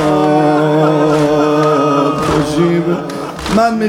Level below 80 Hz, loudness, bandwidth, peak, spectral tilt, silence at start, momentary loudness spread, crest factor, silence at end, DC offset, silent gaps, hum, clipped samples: -38 dBFS; -12 LUFS; 16.5 kHz; 0 dBFS; -6.5 dB/octave; 0 s; 6 LU; 12 dB; 0 s; under 0.1%; none; none; under 0.1%